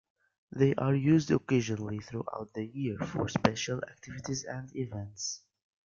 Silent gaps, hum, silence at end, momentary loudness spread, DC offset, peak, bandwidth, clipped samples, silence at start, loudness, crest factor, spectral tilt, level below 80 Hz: none; none; 0.5 s; 13 LU; under 0.1%; -4 dBFS; 7.4 kHz; under 0.1%; 0.55 s; -32 LUFS; 28 dB; -6 dB/octave; -62 dBFS